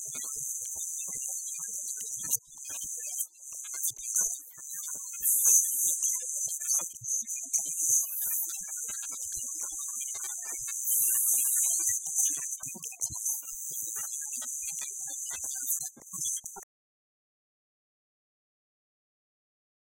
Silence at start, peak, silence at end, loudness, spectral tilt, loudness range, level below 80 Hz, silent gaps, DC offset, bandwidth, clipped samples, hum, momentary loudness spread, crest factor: 0 s; -10 dBFS; 3.3 s; -29 LUFS; 1.5 dB/octave; 9 LU; -72 dBFS; none; under 0.1%; 16.5 kHz; under 0.1%; none; 12 LU; 24 dB